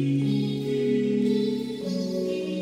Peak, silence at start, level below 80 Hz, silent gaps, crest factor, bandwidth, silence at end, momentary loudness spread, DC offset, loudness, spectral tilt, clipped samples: -14 dBFS; 0 s; -68 dBFS; none; 12 dB; 14.5 kHz; 0 s; 5 LU; under 0.1%; -26 LUFS; -7.5 dB/octave; under 0.1%